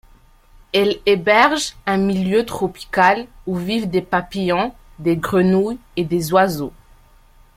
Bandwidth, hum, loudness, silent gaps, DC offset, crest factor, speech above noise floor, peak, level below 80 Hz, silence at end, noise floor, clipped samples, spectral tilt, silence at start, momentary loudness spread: 16 kHz; none; -18 LUFS; none; under 0.1%; 18 dB; 31 dB; 0 dBFS; -46 dBFS; 0.85 s; -49 dBFS; under 0.1%; -5.5 dB/octave; 0.75 s; 10 LU